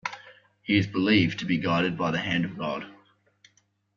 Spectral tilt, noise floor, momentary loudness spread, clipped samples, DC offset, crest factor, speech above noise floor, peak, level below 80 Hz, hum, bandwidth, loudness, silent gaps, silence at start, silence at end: -6.5 dB/octave; -67 dBFS; 16 LU; under 0.1%; under 0.1%; 20 dB; 42 dB; -8 dBFS; -60 dBFS; none; 7.4 kHz; -26 LUFS; none; 0.05 s; 1.05 s